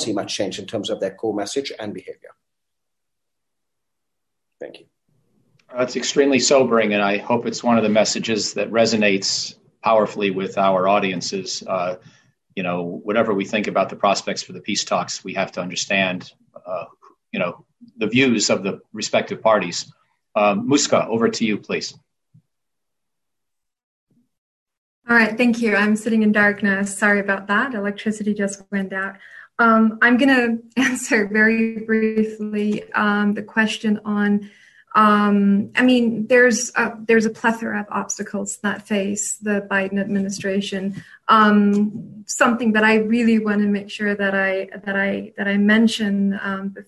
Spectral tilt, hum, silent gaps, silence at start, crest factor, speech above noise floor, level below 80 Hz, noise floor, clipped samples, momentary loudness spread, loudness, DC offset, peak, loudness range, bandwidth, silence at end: -4 dB/octave; none; 23.83-24.07 s, 24.38-24.66 s, 24.78-25.02 s; 0 s; 16 dB; 64 dB; -62 dBFS; -83 dBFS; under 0.1%; 11 LU; -19 LUFS; under 0.1%; -4 dBFS; 7 LU; 12 kHz; 0.05 s